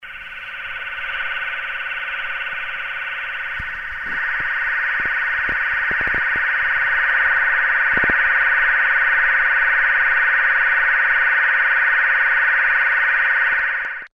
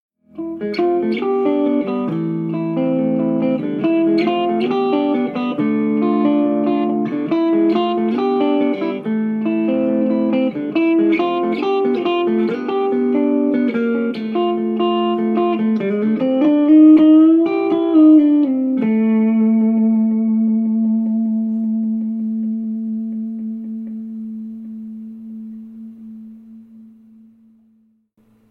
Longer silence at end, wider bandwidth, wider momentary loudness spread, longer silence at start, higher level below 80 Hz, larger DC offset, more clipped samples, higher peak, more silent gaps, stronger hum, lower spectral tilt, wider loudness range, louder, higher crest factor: second, 0.05 s vs 1.65 s; first, 6.6 kHz vs 4.8 kHz; second, 10 LU vs 15 LU; second, 0 s vs 0.35 s; first, -46 dBFS vs -68 dBFS; neither; neither; about the same, -4 dBFS vs -2 dBFS; neither; neither; second, -3.5 dB/octave vs -9.5 dB/octave; second, 9 LU vs 14 LU; about the same, -17 LUFS vs -17 LUFS; about the same, 16 dB vs 14 dB